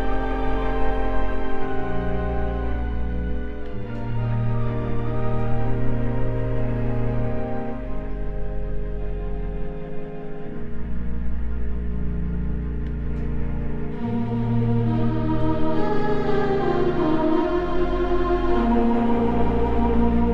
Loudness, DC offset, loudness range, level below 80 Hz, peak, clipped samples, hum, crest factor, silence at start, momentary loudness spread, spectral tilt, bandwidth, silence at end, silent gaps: -25 LUFS; under 0.1%; 10 LU; -28 dBFS; -8 dBFS; under 0.1%; none; 14 dB; 0 s; 11 LU; -9.5 dB/octave; 4.9 kHz; 0 s; none